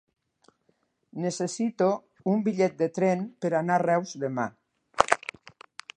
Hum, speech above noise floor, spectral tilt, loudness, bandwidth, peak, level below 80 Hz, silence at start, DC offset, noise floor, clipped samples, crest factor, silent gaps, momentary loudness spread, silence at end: none; 45 dB; -5.5 dB/octave; -27 LUFS; 11 kHz; 0 dBFS; -66 dBFS; 1.15 s; under 0.1%; -71 dBFS; under 0.1%; 28 dB; none; 13 LU; 0.8 s